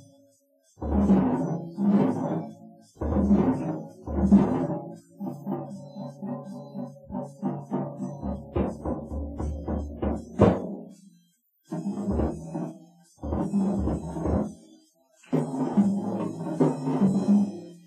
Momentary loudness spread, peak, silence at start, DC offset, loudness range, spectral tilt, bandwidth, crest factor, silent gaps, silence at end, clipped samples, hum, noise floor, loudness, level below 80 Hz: 15 LU; -4 dBFS; 0.8 s; under 0.1%; 8 LU; -9.5 dB/octave; 9.6 kHz; 24 dB; none; 0.05 s; under 0.1%; none; -66 dBFS; -27 LUFS; -40 dBFS